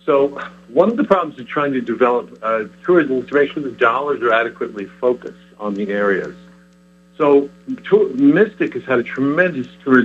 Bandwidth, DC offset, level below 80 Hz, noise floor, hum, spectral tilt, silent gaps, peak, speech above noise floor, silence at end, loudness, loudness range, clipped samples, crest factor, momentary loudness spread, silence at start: 7.4 kHz; under 0.1%; -60 dBFS; -49 dBFS; none; -7.5 dB/octave; none; 0 dBFS; 32 dB; 0 s; -17 LUFS; 4 LU; under 0.1%; 18 dB; 11 LU; 0.05 s